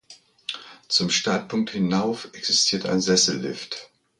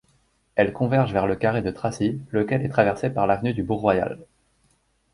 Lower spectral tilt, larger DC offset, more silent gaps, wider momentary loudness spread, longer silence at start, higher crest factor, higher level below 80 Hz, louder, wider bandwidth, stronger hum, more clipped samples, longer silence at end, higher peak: second, -3 dB/octave vs -7.5 dB/octave; neither; neither; first, 15 LU vs 6 LU; second, 0.1 s vs 0.55 s; about the same, 20 dB vs 20 dB; second, -62 dBFS vs -50 dBFS; about the same, -22 LUFS vs -23 LUFS; about the same, 11 kHz vs 11.5 kHz; neither; neither; second, 0.35 s vs 0.9 s; about the same, -6 dBFS vs -4 dBFS